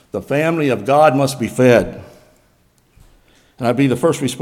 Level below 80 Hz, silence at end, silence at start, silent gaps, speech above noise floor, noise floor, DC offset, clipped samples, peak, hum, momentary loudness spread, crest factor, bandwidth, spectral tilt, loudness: -48 dBFS; 0 s; 0.15 s; none; 41 dB; -56 dBFS; under 0.1%; under 0.1%; 0 dBFS; none; 9 LU; 16 dB; 16.5 kHz; -6 dB/octave; -15 LUFS